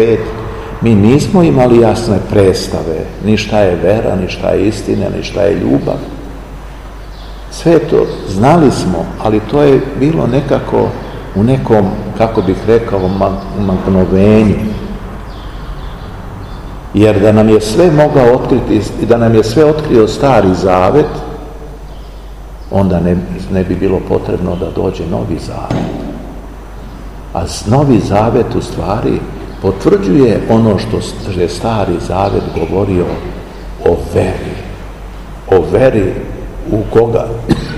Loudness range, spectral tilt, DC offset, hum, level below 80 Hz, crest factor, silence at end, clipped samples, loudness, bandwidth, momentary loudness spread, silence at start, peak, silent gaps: 6 LU; -7.5 dB/octave; 0.6%; none; -26 dBFS; 12 dB; 0 s; 1%; -11 LUFS; 15 kHz; 19 LU; 0 s; 0 dBFS; none